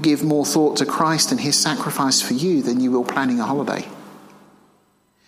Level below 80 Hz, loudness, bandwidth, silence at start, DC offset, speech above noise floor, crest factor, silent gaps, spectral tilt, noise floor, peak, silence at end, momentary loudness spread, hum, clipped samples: -66 dBFS; -19 LUFS; 16 kHz; 0 s; under 0.1%; 42 dB; 18 dB; none; -3.5 dB/octave; -61 dBFS; -2 dBFS; 1.1 s; 5 LU; 50 Hz at -45 dBFS; under 0.1%